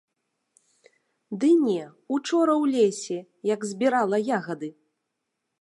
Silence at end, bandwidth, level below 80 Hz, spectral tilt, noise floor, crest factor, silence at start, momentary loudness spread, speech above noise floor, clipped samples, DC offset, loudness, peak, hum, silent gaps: 0.9 s; 11.5 kHz; -82 dBFS; -5 dB/octave; -81 dBFS; 16 dB; 1.3 s; 13 LU; 57 dB; under 0.1%; under 0.1%; -24 LUFS; -10 dBFS; none; none